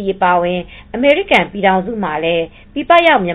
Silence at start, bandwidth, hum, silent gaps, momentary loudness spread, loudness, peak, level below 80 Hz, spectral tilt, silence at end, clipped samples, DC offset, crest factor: 0 s; 10 kHz; none; none; 14 LU; -14 LUFS; 0 dBFS; -42 dBFS; -6.5 dB/octave; 0 s; under 0.1%; under 0.1%; 14 dB